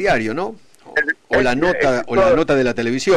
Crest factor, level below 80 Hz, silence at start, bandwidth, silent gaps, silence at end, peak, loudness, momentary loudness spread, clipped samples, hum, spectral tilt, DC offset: 10 dB; -40 dBFS; 0 s; 11 kHz; none; 0 s; -8 dBFS; -17 LUFS; 8 LU; under 0.1%; none; -5 dB/octave; under 0.1%